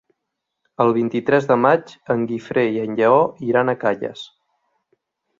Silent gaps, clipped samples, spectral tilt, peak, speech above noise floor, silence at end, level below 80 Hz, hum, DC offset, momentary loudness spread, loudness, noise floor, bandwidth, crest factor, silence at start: none; under 0.1%; -7.5 dB/octave; -2 dBFS; 61 dB; 1.15 s; -64 dBFS; none; under 0.1%; 9 LU; -19 LUFS; -79 dBFS; 7.6 kHz; 18 dB; 0.8 s